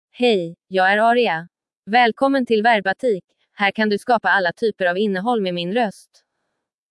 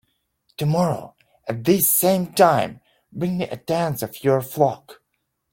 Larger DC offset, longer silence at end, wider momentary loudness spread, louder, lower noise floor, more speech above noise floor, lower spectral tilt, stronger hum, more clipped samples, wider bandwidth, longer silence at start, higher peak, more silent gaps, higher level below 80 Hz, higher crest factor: neither; first, 1 s vs 0.6 s; second, 7 LU vs 15 LU; about the same, -19 LUFS vs -21 LUFS; about the same, -77 dBFS vs -75 dBFS; first, 59 dB vs 54 dB; about the same, -5.5 dB/octave vs -5 dB/octave; neither; neither; second, 12 kHz vs 17 kHz; second, 0.2 s vs 0.6 s; about the same, -4 dBFS vs -2 dBFS; first, 1.77-1.83 s, 3.24-3.28 s vs none; second, -72 dBFS vs -60 dBFS; about the same, 16 dB vs 20 dB